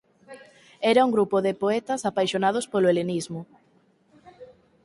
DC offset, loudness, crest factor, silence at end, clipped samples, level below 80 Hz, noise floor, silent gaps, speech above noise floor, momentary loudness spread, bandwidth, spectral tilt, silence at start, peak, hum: under 0.1%; -23 LUFS; 18 dB; 0.4 s; under 0.1%; -68 dBFS; -62 dBFS; none; 39 dB; 9 LU; 11.5 kHz; -5 dB/octave; 0.3 s; -6 dBFS; none